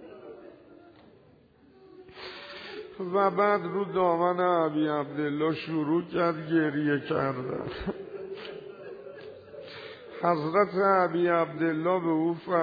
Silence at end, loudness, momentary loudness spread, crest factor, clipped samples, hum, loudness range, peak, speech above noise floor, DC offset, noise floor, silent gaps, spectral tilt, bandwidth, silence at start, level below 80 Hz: 0 s; -27 LUFS; 19 LU; 18 dB; under 0.1%; none; 8 LU; -12 dBFS; 32 dB; under 0.1%; -58 dBFS; none; -9 dB/octave; 5 kHz; 0 s; -62 dBFS